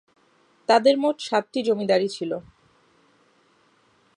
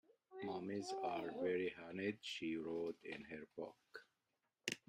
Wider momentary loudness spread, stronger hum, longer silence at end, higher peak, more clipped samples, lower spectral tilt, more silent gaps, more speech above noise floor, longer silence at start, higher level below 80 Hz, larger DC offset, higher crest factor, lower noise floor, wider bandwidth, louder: about the same, 13 LU vs 11 LU; neither; first, 1.75 s vs 0.1 s; first, -6 dBFS vs -22 dBFS; neither; about the same, -4.5 dB/octave vs -4.5 dB/octave; neither; about the same, 40 dB vs 43 dB; first, 0.7 s vs 0.3 s; first, -70 dBFS vs -84 dBFS; neither; second, 20 dB vs 26 dB; second, -62 dBFS vs -89 dBFS; second, 10.5 kHz vs 15 kHz; first, -23 LUFS vs -46 LUFS